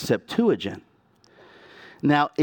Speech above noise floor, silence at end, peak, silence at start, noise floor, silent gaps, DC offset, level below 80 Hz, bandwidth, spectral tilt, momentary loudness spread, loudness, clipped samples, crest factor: 37 dB; 0 s; -8 dBFS; 0 s; -59 dBFS; none; under 0.1%; -64 dBFS; 18 kHz; -6 dB/octave; 12 LU; -24 LUFS; under 0.1%; 18 dB